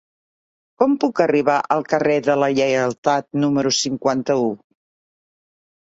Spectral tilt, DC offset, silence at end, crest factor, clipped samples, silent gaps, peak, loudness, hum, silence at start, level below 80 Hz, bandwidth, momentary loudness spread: -4.5 dB/octave; under 0.1%; 1.3 s; 18 dB; under 0.1%; 2.98-3.03 s; -2 dBFS; -19 LUFS; none; 0.8 s; -62 dBFS; 8 kHz; 3 LU